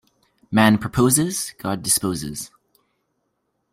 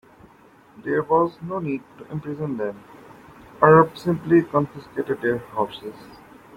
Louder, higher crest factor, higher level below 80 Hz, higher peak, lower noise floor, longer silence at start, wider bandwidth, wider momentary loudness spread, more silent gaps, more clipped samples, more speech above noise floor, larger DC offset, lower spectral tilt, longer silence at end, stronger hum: about the same, -20 LUFS vs -22 LUFS; about the same, 20 dB vs 20 dB; first, -50 dBFS vs -58 dBFS; about the same, -2 dBFS vs -2 dBFS; first, -73 dBFS vs -52 dBFS; second, 0.5 s vs 0.8 s; about the same, 16 kHz vs 15.5 kHz; second, 14 LU vs 18 LU; neither; neither; first, 53 dB vs 30 dB; neither; second, -4 dB/octave vs -8.5 dB/octave; first, 1.25 s vs 0.4 s; neither